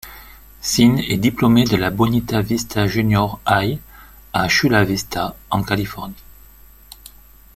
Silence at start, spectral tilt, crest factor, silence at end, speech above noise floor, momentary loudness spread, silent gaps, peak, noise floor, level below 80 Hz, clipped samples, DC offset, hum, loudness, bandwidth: 0.05 s; -5 dB/octave; 18 dB; 1.35 s; 27 dB; 11 LU; none; -2 dBFS; -45 dBFS; -40 dBFS; under 0.1%; under 0.1%; none; -18 LUFS; 16.5 kHz